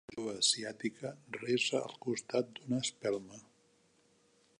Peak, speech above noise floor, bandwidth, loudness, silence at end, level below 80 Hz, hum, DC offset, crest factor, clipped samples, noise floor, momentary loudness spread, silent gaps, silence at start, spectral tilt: -16 dBFS; 34 dB; 11 kHz; -35 LUFS; 1.2 s; -80 dBFS; none; under 0.1%; 22 dB; under 0.1%; -70 dBFS; 13 LU; none; 0.1 s; -3 dB/octave